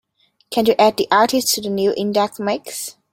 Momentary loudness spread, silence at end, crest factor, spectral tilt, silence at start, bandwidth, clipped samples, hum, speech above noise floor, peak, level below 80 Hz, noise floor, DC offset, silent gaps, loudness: 10 LU; 0.2 s; 18 dB; -3 dB/octave; 0.5 s; 16.5 kHz; under 0.1%; none; 26 dB; 0 dBFS; -60 dBFS; -43 dBFS; under 0.1%; none; -18 LUFS